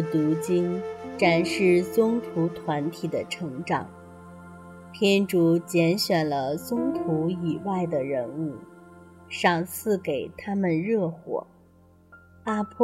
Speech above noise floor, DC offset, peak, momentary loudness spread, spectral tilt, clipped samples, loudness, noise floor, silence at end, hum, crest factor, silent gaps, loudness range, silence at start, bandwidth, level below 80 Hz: 31 dB; under 0.1%; -8 dBFS; 15 LU; -6 dB/octave; under 0.1%; -26 LUFS; -56 dBFS; 0 s; none; 18 dB; none; 4 LU; 0 s; 16 kHz; -66 dBFS